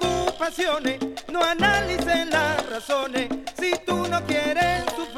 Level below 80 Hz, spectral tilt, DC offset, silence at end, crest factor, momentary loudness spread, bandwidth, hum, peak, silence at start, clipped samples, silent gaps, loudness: -44 dBFS; -3.5 dB/octave; under 0.1%; 0 s; 18 dB; 7 LU; 16.5 kHz; none; -6 dBFS; 0 s; under 0.1%; none; -23 LUFS